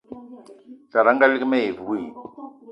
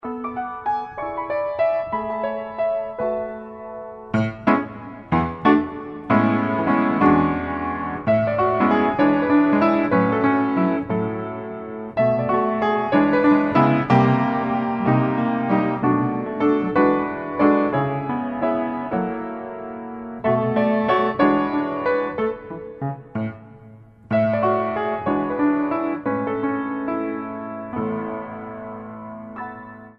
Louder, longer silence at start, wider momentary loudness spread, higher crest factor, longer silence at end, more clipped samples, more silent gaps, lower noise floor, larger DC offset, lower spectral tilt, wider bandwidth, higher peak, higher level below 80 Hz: about the same, -20 LUFS vs -21 LUFS; about the same, 0.1 s vs 0.05 s; first, 24 LU vs 15 LU; about the same, 22 dB vs 20 dB; about the same, 0 s vs 0.05 s; neither; neither; about the same, -46 dBFS vs -45 dBFS; neither; second, -6.5 dB/octave vs -9.5 dB/octave; about the same, 5.8 kHz vs 5.8 kHz; about the same, -2 dBFS vs -2 dBFS; second, -68 dBFS vs -52 dBFS